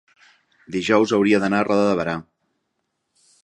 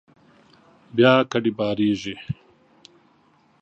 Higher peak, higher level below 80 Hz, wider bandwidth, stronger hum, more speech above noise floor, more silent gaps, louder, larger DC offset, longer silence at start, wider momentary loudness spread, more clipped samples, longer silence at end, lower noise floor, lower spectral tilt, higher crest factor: about the same, -2 dBFS vs -2 dBFS; about the same, -58 dBFS vs -58 dBFS; first, 10.5 kHz vs 8 kHz; neither; first, 56 dB vs 39 dB; neither; about the same, -19 LUFS vs -21 LUFS; neither; second, 0.7 s vs 0.95 s; second, 11 LU vs 17 LU; neither; about the same, 1.25 s vs 1.3 s; first, -75 dBFS vs -59 dBFS; about the same, -6 dB/octave vs -6.5 dB/octave; about the same, 20 dB vs 22 dB